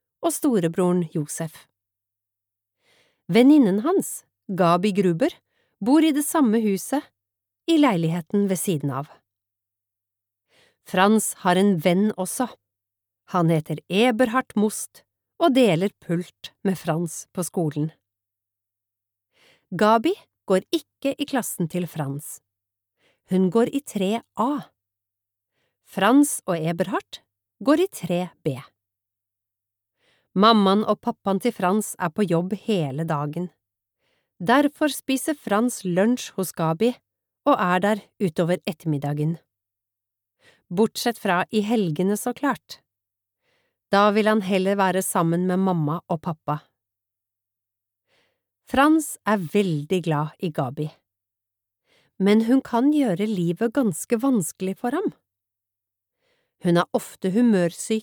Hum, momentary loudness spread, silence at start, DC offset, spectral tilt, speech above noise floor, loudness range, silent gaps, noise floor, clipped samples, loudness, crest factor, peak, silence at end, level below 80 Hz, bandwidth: none; 11 LU; 0.2 s; under 0.1%; -5.5 dB/octave; 64 dB; 5 LU; none; -86 dBFS; under 0.1%; -22 LUFS; 22 dB; -2 dBFS; 0 s; -66 dBFS; over 20 kHz